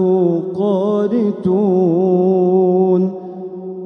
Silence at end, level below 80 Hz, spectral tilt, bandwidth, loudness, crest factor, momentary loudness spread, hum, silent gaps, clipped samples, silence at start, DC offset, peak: 0 s; -62 dBFS; -11 dB/octave; 5.8 kHz; -15 LUFS; 10 dB; 12 LU; none; none; under 0.1%; 0 s; under 0.1%; -4 dBFS